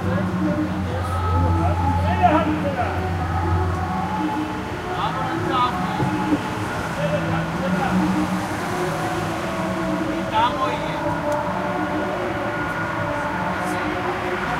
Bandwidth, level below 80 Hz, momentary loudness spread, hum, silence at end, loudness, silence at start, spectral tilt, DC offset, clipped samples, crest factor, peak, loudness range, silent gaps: 15.5 kHz; -40 dBFS; 4 LU; none; 0 s; -22 LUFS; 0 s; -6.5 dB/octave; under 0.1%; under 0.1%; 18 dB; -4 dBFS; 3 LU; none